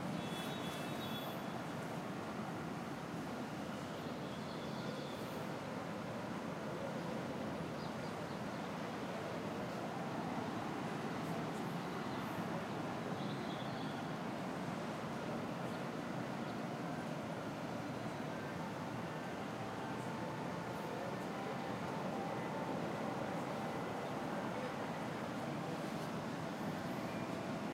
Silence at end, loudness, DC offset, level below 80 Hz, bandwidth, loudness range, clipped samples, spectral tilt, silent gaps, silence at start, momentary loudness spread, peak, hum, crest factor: 0 s; -43 LUFS; under 0.1%; -72 dBFS; 16 kHz; 2 LU; under 0.1%; -5.5 dB/octave; none; 0 s; 2 LU; -28 dBFS; none; 14 dB